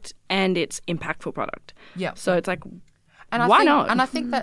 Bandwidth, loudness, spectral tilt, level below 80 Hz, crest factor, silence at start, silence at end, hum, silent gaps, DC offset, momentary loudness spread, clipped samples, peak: 12 kHz; -22 LUFS; -4.5 dB/octave; -56 dBFS; 20 dB; 0 s; 0 s; none; none; under 0.1%; 15 LU; under 0.1%; -4 dBFS